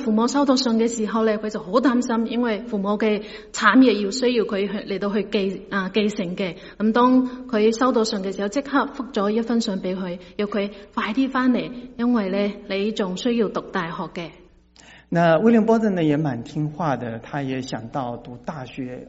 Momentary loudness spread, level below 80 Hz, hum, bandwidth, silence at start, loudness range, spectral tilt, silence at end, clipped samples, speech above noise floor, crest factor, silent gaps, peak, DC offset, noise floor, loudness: 12 LU; -54 dBFS; none; 8 kHz; 0 s; 4 LU; -4.5 dB/octave; 0 s; under 0.1%; 29 dB; 20 dB; none; -2 dBFS; under 0.1%; -50 dBFS; -22 LUFS